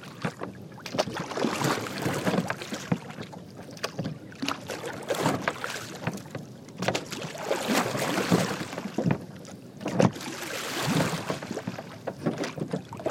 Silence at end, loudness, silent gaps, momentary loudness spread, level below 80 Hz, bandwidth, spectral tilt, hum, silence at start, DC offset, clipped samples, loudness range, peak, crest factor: 0 s; -30 LUFS; none; 14 LU; -64 dBFS; 16.5 kHz; -4.5 dB/octave; none; 0 s; under 0.1%; under 0.1%; 4 LU; -4 dBFS; 26 dB